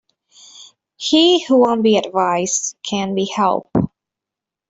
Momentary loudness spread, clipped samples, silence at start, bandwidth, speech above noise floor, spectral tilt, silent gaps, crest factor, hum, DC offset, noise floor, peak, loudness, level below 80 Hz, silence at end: 9 LU; under 0.1%; 0.55 s; 8.2 kHz; 70 dB; -4 dB/octave; none; 16 dB; none; under 0.1%; -86 dBFS; -2 dBFS; -16 LUFS; -56 dBFS; 0.85 s